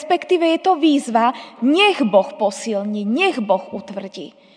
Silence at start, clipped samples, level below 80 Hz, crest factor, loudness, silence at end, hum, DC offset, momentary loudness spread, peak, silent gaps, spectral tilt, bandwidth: 0 s; under 0.1%; -78 dBFS; 16 dB; -17 LUFS; 0.25 s; none; under 0.1%; 16 LU; -2 dBFS; none; -4.5 dB/octave; 10 kHz